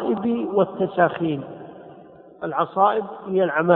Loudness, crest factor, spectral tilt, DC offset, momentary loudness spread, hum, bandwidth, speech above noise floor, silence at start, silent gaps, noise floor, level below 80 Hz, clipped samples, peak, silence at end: -22 LUFS; 20 dB; -11 dB/octave; under 0.1%; 18 LU; none; 4.1 kHz; 25 dB; 0 s; none; -45 dBFS; -64 dBFS; under 0.1%; -2 dBFS; 0 s